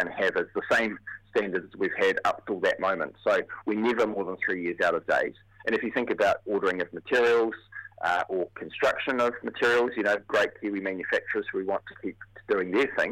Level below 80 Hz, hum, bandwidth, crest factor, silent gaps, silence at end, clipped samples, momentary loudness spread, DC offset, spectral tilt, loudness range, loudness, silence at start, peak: -64 dBFS; none; 14.5 kHz; 16 dB; none; 0 s; under 0.1%; 8 LU; under 0.1%; -4.5 dB/octave; 1 LU; -27 LUFS; 0 s; -12 dBFS